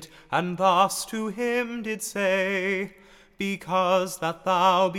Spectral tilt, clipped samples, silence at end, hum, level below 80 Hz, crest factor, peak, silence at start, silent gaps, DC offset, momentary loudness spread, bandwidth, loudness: -4 dB/octave; under 0.1%; 0 s; none; -62 dBFS; 18 dB; -6 dBFS; 0 s; none; under 0.1%; 10 LU; 17 kHz; -25 LUFS